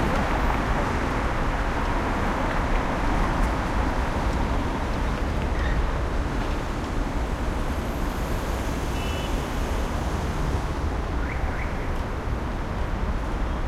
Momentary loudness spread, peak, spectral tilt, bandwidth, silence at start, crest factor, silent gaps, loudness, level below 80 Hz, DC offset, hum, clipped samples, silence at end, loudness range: 4 LU; -10 dBFS; -6 dB/octave; 14.5 kHz; 0 s; 14 dB; none; -27 LUFS; -28 dBFS; under 0.1%; none; under 0.1%; 0 s; 3 LU